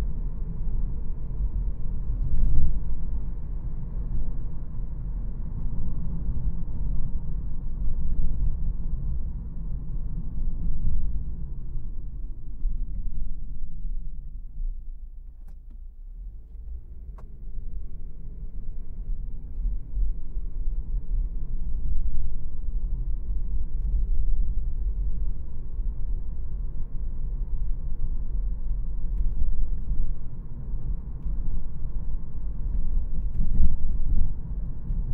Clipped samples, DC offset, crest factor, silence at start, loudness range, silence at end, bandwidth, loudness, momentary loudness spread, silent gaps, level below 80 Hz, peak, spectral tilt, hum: under 0.1%; under 0.1%; 18 dB; 0 s; 9 LU; 0 s; 1.1 kHz; -34 LUFS; 11 LU; none; -26 dBFS; -4 dBFS; -12 dB/octave; none